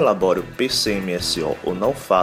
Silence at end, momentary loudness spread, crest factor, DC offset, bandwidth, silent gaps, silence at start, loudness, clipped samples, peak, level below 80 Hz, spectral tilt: 0 s; 4 LU; 16 dB; under 0.1%; 16 kHz; none; 0 s; -21 LUFS; under 0.1%; -4 dBFS; -46 dBFS; -4 dB/octave